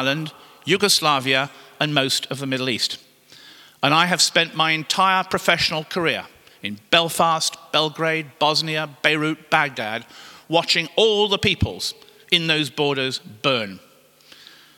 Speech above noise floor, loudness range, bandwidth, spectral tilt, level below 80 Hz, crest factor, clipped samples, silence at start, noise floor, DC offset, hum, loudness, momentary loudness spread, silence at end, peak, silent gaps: 30 dB; 2 LU; 18 kHz; -3 dB/octave; -52 dBFS; 22 dB; under 0.1%; 0 s; -51 dBFS; under 0.1%; none; -20 LUFS; 11 LU; 1 s; 0 dBFS; none